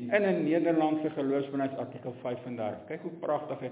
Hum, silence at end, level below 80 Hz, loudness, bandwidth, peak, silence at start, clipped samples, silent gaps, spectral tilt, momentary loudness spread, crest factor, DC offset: none; 0 s; -76 dBFS; -31 LUFS; 4 kHz; -10 dBFS; 0 s; under 0.1%; none; -6 dB/octave; 12 LU; 20 dB; under 0.1%